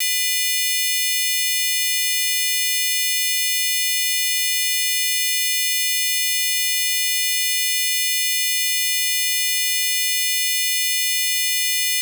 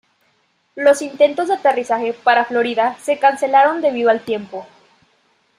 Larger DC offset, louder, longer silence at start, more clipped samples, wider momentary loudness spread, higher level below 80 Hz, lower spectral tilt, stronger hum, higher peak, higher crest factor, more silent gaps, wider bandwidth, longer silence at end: neither; about the same, -17 LUFS vs -16 LUFS; second, 0 s vs 0.75 s; neither; second, 0 LU vs 7 LU; second, under -90 dBFS vs -70 dBFS; second, 12 dB/octave vs -3.5 dB/octave; neither; second, -8 dBFS vs -2 dBFS; about the same, 12 dB vs 16 dB; neither; first, over 20 kHz vs 12.5 kHz; second, 0 s vs 0.95 s